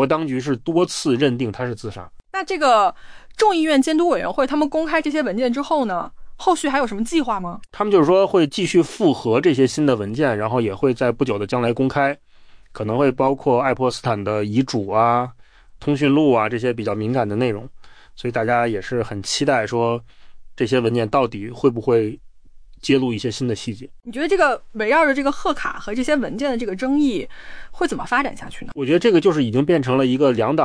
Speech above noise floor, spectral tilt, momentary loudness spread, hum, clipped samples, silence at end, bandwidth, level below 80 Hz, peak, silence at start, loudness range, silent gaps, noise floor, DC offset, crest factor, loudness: 23 dB; -5.5 dB/octave; 11 LU; none; under 0.1%; 0 s; 10.5 kHz; -46 dBFS; -4 dBFS; 0 s; 4 LU; none; -42 dBFS; under 0.1%; 14 dB; -19 LUFS